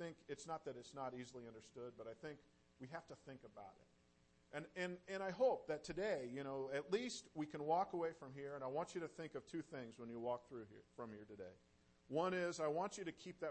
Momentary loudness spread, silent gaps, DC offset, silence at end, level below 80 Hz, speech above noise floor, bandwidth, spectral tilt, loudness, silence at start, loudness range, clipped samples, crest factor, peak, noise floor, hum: 17 LU; none; under 0.1%; 0 s; -78 dBFS; 28 dB; 8.4 kHz; -5 dB/octave; -46 LUFS; 0 s; 11 LU; under 0.1%; 20 dB; -28 dBFS; -75 dBFS; none